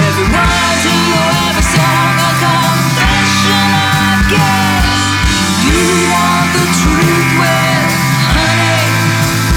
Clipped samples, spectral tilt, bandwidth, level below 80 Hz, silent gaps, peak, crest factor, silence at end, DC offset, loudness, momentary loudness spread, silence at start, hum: under 0.1%; -4 dB/octave; 19 kHz; -22 dBFS; none; 0 dBFS; 10 dB; 0 s; under 0.1%; -10 LUFS; 2 LU; 0 s; none